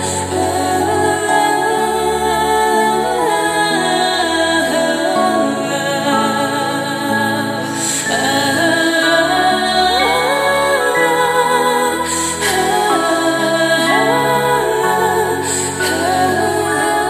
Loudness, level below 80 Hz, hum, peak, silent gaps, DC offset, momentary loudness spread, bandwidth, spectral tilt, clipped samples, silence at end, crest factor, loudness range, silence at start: -14 LUFS; -46 dBFS; none; 0 dBFS; none; under 0.1%; 4 LU; 15.5 kHz; -3 dB/octave; under 0.1%; 0 s; 14 dB; 2 LU; 0 s